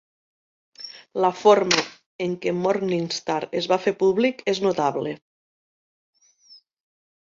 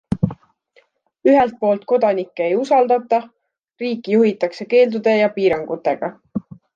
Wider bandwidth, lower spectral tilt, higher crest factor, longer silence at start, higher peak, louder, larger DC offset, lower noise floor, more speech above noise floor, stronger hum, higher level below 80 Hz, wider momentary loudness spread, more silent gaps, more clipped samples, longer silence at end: about the same, 7.6 kHz vs 7.6 kHz; second, -4.5 dB/octave vs -7.5 dB/octave; first, 22 dB vs 16 dB; first, 0.8 s vs 0.1 s; about the same, -2 dBFS vs -4 dBFS; second, -22 LUFS vs -18 LUFS; neither; second, -54 dBFS vs -58 dBFS; second, 32 dB vs 41 dB; neither; second, -68 dBFS vs -52 dBFS; first, 16 LU vs 10 LU; first, 2.06-2.19 s vs 3.59-3.63 s; neither; first, 2.15 s vs 0.35 s